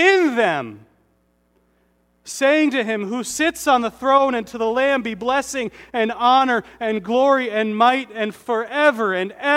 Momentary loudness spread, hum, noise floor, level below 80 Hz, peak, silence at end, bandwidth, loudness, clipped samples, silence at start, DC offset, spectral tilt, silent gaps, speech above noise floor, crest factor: 9 LU; 60 Hz at -50 dBFS; -63 dBFS; -60 dBFS; -2 dBFS; 0 s; 16.5 kHz; -19 LUFS; under 0.1%; 0 s; under 0.1%; -3.5 dB/octave; none; 44 dB; 18 dB